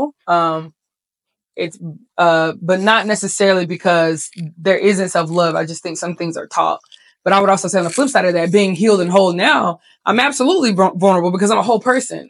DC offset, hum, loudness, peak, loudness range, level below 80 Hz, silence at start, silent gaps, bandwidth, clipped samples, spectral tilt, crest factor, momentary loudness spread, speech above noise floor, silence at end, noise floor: under 0.1%; none; -15 LUFS; 0 dBFS; 3 LU; -72 dBFS; 0 s; none; 12 kHz; under 0.1%; -4.5 dB/octave; 16 dB; 11 LU; 69 dB; 0.05 s; -84 dBFS